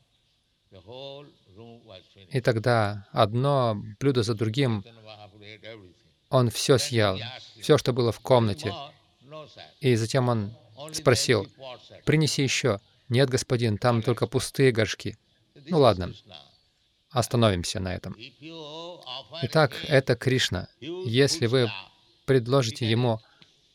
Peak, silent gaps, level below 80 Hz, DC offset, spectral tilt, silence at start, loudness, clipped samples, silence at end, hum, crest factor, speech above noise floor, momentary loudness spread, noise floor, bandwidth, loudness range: -6 dBFS; none; -58 dBFS; under 0.1%; -5 dB/octave; 0.75 s; -25 LUFS; under 0.1%; 0.55 s; none; 20 dB; 44 dB; 20 LU; -69 dBFS; 15.5 kHz; 3 LU